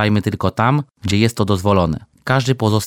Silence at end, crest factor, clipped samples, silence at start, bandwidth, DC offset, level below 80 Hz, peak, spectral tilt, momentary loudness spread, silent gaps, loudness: 0 s; 16 dB; under 0.1%; 0 s; 16.5 kHz; under 0.1%; -42 dBFS; 0 dBFS; -6 dB/octave; 5 LU; none; -17 LUFS